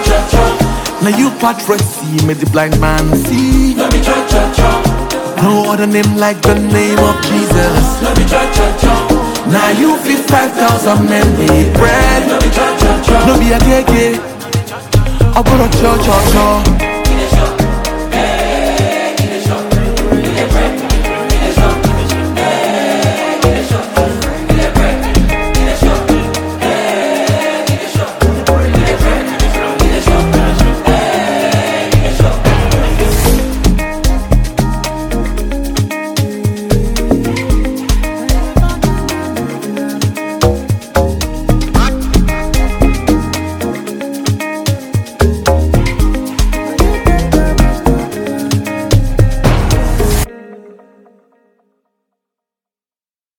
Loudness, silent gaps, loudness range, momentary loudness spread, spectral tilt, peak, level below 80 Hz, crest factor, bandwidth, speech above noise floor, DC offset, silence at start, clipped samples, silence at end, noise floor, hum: -12 LUFS; none; 5 LU; 7 LU; -5.5 dB/octave; 0 dBFS; -16 dBFS; 10 dB; 18 kHz; over 81 dB; 0.2%; 0 s; under 0.1%; 2.65 s; under -90 dBFS; none